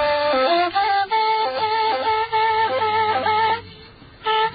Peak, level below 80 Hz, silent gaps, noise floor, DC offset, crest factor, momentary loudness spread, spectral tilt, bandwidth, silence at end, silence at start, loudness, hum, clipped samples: -8 dBFS; -54 dBFS; none; -44 dBFS; under 0.1%; 12 dB; 3 LU; -8.5 dB/octave; 5 kHz; 0 s; 0 s; -20 LUFS; none; under 0.1%